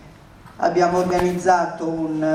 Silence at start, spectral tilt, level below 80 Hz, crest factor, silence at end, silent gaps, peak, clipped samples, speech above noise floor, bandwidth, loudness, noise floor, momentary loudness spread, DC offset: 0.05 s; -6 dB/octave; -48 dBFS; 18 dB; 0 s; none; -2 dBFS; under 0.1%; 25 dB; 15 kHz; -20 LUFS; -44 dBFS; 6 LU; under 0.1%